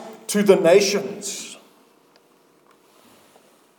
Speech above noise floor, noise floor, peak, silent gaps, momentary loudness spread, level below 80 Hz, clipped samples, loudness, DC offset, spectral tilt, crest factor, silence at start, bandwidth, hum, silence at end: 40 dB; -57 dBFS; 0 dBFS; none; 17 LU; -82 dBFS; under 0.1%; -19 LUFS; under 0.1%; -4 dB/octave; 22 dB; 0 s; 19 kHz; none; 2.25 s